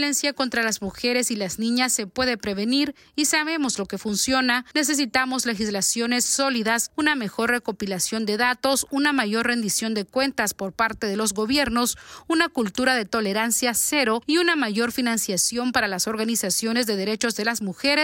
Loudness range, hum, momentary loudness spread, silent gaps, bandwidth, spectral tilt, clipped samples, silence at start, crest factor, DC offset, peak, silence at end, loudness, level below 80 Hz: 2 LU; none; 5 LU; none; 16.5 kHz; -2 dB/octave; under 0.1%; 0 s; 16 dB; under 0.1%; -6 dBFS; 0 s; -22 LUFS; -54 dBFS